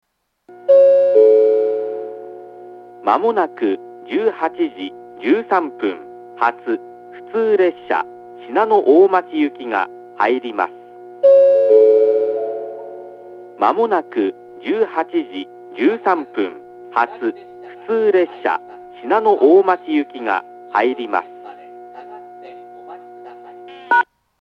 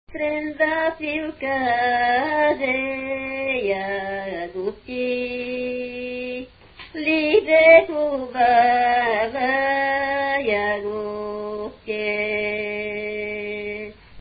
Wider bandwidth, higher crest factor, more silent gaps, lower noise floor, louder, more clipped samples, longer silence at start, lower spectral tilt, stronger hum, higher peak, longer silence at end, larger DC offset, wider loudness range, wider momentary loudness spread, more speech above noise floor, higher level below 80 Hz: first, 5.6 kHz vs 5 kHz; about the same, 16 dB vs 20 dB; neither; second, -37 dBFS vs -44 dBFS; first, -17 LUFS vs -21 LUFS; neither; first, 0.5 s vs 0.1 s; second, -6.5 dB/octave vs -9 dB/octave; neither; about the same, 0 dBFS vs -2 dBFS; first, 0.4 s vs 0 s; neither; second, 6 LU vs 9 LU; first, 26 LU vs 13 LU; about the same, 21 dB vs 24 dB; second, -76 dBFS vs -52 dBFS